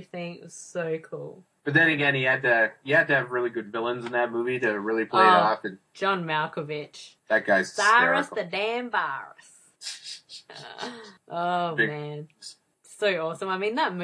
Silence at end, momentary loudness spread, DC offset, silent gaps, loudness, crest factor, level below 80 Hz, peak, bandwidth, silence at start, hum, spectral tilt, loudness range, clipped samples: 0 s; 20 LU; under 0.1%; none; -24 LUFS; 20 dB; -78 dBFS; -6 dBFS; 11 kHz; 0 s; none; -4.5 dB/octave; 8 LU; under 0.1%